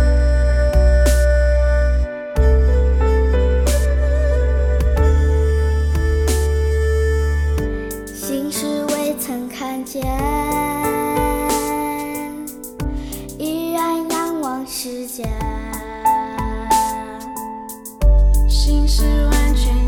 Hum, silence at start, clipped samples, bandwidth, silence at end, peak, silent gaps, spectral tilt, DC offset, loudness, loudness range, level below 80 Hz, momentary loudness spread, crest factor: none; 0 s; under 0.1%; 17.5 kHz; 0 s; -2 dBFS; none; -5.5 dB/octave; under 0.1%; -19 LUFS; 6 LU; -18 dBFS; 11 LU; 14 dB